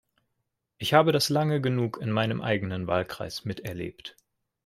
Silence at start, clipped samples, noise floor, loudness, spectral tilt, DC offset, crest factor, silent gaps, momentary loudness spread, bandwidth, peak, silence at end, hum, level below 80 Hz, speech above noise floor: 0.8 s; under 0.1%; -81 dBFS; -27 LUFS; -5.5 dB/octave; under 0.1%; 24 dB; none; 15 LU; 15.5 kHz; -4 dBFS; 0.55 s; none; -62 dBFS; 54 dB